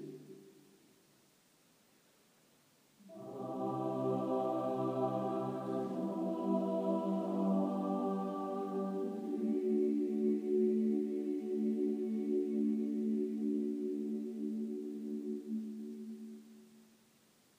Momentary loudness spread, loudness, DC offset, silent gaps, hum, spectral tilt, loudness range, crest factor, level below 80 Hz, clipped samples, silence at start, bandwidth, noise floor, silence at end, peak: 12 LU; -37 LUFS; under 0.1%; none; none; -9 dB/octave; 8 LU; 14 dB; under -90 dBFS; under 0.1%; 0 s; 15.5 kHz; -69 dBFS; 0.8 s; -22 dBFS